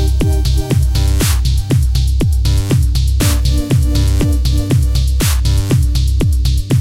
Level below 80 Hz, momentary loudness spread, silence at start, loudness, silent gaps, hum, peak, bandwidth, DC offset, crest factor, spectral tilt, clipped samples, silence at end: -14 dBFS; 1 LU; 0 s; -14 LUFS; none; none; -2 dBFS; 16 kHz; 0.6%; 10 dB; -5.5 dB/octave; under 0.1%; 0 s